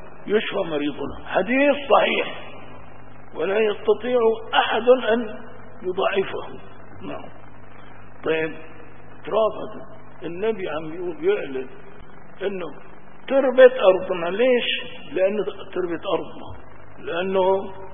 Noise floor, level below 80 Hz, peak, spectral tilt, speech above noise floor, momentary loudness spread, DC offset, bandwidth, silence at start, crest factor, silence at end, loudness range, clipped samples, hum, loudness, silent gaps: -45 dBFS; -56 dBFS; 0 dBFS; -9.5 dB/octave; 23 dB; 21 LU; 2%; 3.7 kHz; 0 s; 22 dB; 0 s; 9 LU; under 0.1%; none; -22 LUFS; none